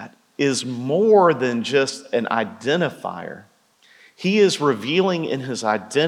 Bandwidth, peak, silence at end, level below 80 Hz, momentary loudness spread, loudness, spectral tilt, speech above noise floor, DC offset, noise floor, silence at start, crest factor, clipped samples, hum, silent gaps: 12.5 kHz; -4 dBFS; 0 s; -82 dBFS; 11 LU; -20 LUFS; -4.5 dB/octave; 36 dB; under 0.1%; -55 dBFS; 0 s; 16 dB; under 0.1%; none; none